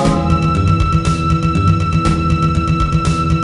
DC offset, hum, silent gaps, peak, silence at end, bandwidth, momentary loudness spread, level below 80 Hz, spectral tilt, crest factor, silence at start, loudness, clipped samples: under 0.1%; none; none; 0 dBFS; 0 s; 11 kHz; 1 LU; -22 dBFS; -7 dB/octave; 12 dB; 0 s; -15 LUFS; under 0.1%